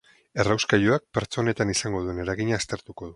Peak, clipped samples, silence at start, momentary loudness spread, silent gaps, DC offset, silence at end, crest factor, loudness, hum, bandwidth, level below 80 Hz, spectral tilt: -4 dBFS; under 0.1%; 0.35 s; 9 LU; none; under 0.1%; 0 s; 22 dB; -25 LUFS; none; 11.5 kHz; -48 dBFS; -4.5 dB/octave